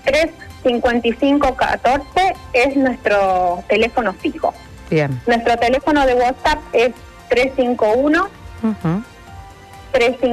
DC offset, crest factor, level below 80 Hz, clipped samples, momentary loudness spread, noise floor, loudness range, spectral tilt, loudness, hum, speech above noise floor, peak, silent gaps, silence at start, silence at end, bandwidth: under 0.1%; 12 dB; -38 dBFS; under 0.1%; 7 LU; -38 dBFS; 2 LU; -5.5 dB/octave; -17 LUFS; none; 22 dB; -4 dBFS; none; 0.05 s; 0 s; 14 kHz